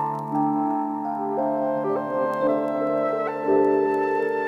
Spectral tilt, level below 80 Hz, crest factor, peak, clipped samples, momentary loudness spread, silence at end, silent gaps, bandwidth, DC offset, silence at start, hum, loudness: -8.5 dB/octave; -70 dBFS; 14 dB; -10 dBFS; under 0.1%; 5 LU; 0 s; none; 6.6 kHz; under 0.1%; 0 s; none; -24 LUFS